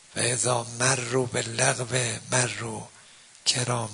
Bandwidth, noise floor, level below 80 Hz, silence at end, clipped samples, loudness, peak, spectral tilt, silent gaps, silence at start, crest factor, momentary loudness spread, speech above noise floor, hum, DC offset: 11 kHz; -52 dBFS; -62 dBFS; 0 s; under 0.1%; -25 LUFS; -4 dBFS; -2.5 dB/octave; none; 0.1 s; 22 dB; 9 LU; 25 dB; none; under 0.1%